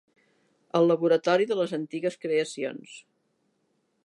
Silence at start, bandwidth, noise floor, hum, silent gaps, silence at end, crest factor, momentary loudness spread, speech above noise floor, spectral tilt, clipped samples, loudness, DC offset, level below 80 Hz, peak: 0.75 s; 11.5 kHz; -73 dBFS; none; none; 1.05 s; 18 dB; 12 LU; 47 dB; -5.5 dB/octave; under 0.1%; -26 LUFS; under 0.1%; -82 dBFS; -10 dBFS